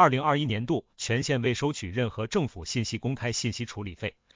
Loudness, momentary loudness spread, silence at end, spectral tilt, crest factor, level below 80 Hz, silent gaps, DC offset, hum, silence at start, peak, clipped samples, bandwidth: -29 LUFS; 9 LU; 0.25 s; -5 dB/octave; 22 dB; -52 dBFS; none; under 0.1%; none; 0 s; -6 dBFS; under 0.1%; 7.6 kHz